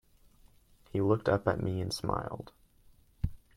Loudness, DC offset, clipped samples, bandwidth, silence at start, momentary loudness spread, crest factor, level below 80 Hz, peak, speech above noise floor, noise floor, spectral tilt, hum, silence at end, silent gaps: -33 LUFS; under 0.1%; under 0.1%; 15 kHz; 0.95 s; 14 LU; 22 dB; -50 dBFS; -12 dBFS; 31 dB; -62 dBFS; -6.5 dB/octave; none; 0.2 s; none